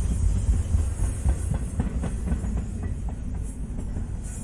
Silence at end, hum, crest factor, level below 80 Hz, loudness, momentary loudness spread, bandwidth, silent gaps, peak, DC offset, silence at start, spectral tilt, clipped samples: 0 s; none; 16 dB; -28 dBFS; -29 LUFS; 8 LU; 11.5 kHz; none; -10 dBFS; under 0.1%; 0 s; -7 dB/octave; under 0.1%